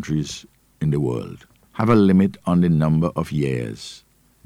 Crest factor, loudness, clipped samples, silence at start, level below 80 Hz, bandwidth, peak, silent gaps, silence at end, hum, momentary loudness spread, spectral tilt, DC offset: 14 dB; -20 LUFS; under 0.1%; 0 s; -46 dBFS; 12 kHz; -6 dBFS; none; 0.5 s; none; 19 LU; -7.5 dB/octave; under 0.1%